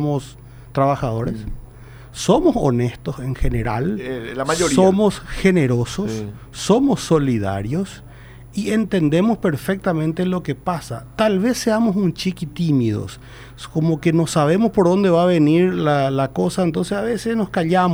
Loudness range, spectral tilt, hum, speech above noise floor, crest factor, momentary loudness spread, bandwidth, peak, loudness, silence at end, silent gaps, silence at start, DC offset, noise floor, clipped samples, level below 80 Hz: 4 LU; -6.5 dB/octave; none; 21 dB; 16 dB; 12 LU; over 20 kHz; -2 dBFS; -19 LUFS; 0 s; none; 0 s; under 0.1%; -39 dBFS; under 0.1%; -36 dBFS